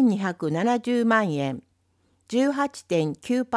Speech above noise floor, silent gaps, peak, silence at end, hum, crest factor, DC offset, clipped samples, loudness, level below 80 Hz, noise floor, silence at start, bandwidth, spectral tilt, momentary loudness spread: 43 dB; none; -8 dBFS; 0 s; none; 16 dB; under 0.1%; under 0.1%; -24 LUFS; -70 dBFS; -67 dBFS; 0 s; 11 kHz; -6 dB/octave; 7 LU